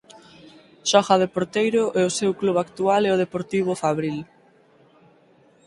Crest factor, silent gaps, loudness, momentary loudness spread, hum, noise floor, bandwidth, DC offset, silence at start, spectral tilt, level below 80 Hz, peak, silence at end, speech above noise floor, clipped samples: 22 dB; none; -22 LUFS; 7 LU; none; -56 dBFS; 11.5 kHz; under 0.1%; 0.85 s; -4.5 dB/octave; -64 dBFS; 0 dBFS; 1.4 s; 35 dB; under 0.1%